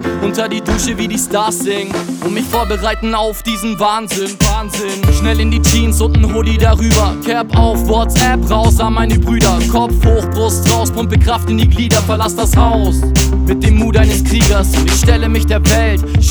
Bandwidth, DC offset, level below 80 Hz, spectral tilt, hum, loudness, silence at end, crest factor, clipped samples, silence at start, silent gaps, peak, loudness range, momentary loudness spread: over 20 kHz; under 0.1%; -16 dBFS; -5 dB/octave; none; -13 LUFS; 0 s; 12 dB; under 0.1%; 0 s; none; 0 dBFS; 4 LU; 5 LU